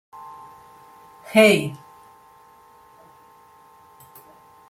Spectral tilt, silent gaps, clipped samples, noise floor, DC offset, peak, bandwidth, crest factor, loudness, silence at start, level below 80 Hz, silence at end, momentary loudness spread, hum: -4.5 dB/octave; none; under 0.1%; -51 dBFS; under 0.1%; -2 dBFS; 16.5 kHz; 24 dB; -18 LUFS; 1.3 s; -68 dBFS; 2.95 s; 28 LU; none